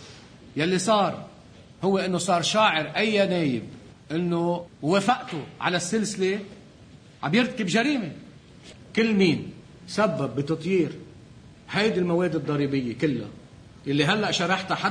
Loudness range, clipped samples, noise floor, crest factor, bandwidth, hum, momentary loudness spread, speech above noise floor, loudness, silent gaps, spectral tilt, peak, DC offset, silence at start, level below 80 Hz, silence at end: 3 LU; under 0.1%; -49 dBFS; 18 dB; 10.5 kHz; none; 14 LU; 25 dB; -25 LUFS; none; -5 dB/octave; -8 dBFS; under 0.1%; 0 s; -60 dBFS; 0 s